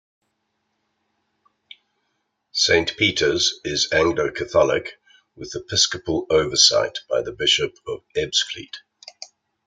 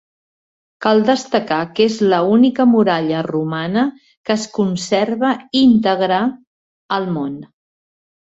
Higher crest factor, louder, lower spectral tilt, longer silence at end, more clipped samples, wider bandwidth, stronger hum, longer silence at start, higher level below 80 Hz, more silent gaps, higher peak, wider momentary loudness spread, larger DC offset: first, 22 dB vs 16 dB; second, -19 LUFS vs -16 LUFS; second, -2 dB/octave vs -5.5 dB/octave; second, 0.4 s vs 0.85 s; neither; first, 9.6 kHz vs 8 kHz; neither; first, 2.55 s vs 0.8 s; first, -52 dBFS vs -58 dBFS; second, none vs 4.17-4.24 s, 6.47-6.89 s; about the same, -2 dBFS vs -2 dBFS; first, 22 LU vs 10 LU; neither